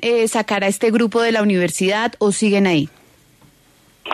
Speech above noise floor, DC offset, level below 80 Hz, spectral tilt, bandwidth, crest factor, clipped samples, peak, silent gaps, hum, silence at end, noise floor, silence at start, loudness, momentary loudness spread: 36 dB; under 0.1%; -60 dBFS; -4.5 dB/octave; 13.5 kHz; 14 dB; under 0.1%; -4 dBFS; none; none; 0 s; -53 dBFS; 0 s; -17 LUFS; 3 LU